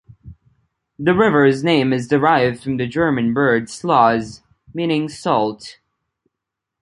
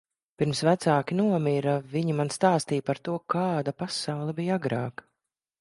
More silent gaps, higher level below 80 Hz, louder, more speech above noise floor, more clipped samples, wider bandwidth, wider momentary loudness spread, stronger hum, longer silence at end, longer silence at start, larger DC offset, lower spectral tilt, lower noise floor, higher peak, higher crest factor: neither; first, -52 dBFS vs -68 dBFS; first, -17 LUFS vs -27 LUFS; first, 65 dB vs 58 dB; neither; about the same, 11.5 kHz vs 11.5 kHz; first, 10 LU vs 7 LU; neither; first, 1.1 s vs 0.7 s; second, 0.25 s vs 0.4 s; neither; about the same, -6 dB/octave vs -6 dB/octave; about the same, -82 dBFS vs -84 dBFS; first, 0 dBFS vs -6 dBFS; about the same, 18 dB vs 20 dB